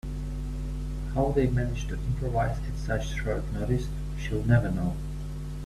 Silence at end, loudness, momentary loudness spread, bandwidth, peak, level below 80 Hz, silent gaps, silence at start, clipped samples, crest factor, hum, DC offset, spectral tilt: 0 s; -30 LUFS; 11 LU; 13 kHz; -8 dBFS; -34 dBFS; none; 0.05 s; under 0.1%; 20 dB; none; under 0.1%; -7.5 dB/octave